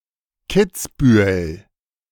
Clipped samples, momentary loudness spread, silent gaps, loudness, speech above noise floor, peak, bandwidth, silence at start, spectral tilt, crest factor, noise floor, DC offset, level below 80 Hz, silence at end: under 0.1%; 14 LU; none; -17 LUFS; 27 dB; -2 dBFS; 18.5 kHz; 0.5 s; -6 dB/octave; 16 dB; -43 dBFS; under 0.1%; -38 dBFS; 0.55 s